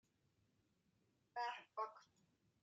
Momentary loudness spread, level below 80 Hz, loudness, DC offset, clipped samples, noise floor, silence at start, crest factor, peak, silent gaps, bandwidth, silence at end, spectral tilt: 8 LU; under -90 dBFS; -49 LUFS; under 0.1%; under 0.1%; -82 dBFS; 1.35 s; 22 dB; -32 dBFS; none; 8.8 kHz; 0.6 s; -2 dB/octave